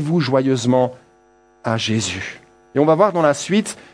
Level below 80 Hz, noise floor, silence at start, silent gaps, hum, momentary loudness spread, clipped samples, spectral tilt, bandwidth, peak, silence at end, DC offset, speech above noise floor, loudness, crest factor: -60 dBFS; -54 dBFS; 0 s; none; none; 11 LU; under 0.1%; -5.5 dB/octave; 10.5 kHz; 0 dBFS; 0.2 s; under 0.1%; 36 dB; -18 LUFS; 18 dB